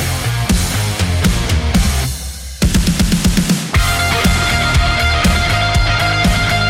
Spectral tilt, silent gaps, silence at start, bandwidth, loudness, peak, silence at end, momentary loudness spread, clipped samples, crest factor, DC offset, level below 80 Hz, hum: -4 dB/octave; none; 0 s; 16.5 kHz; -14 LUFS; 0 dBFS; 0 s; 4 LU; under 0.1%; 14 dB; under 0.1%; -20 dBFS; none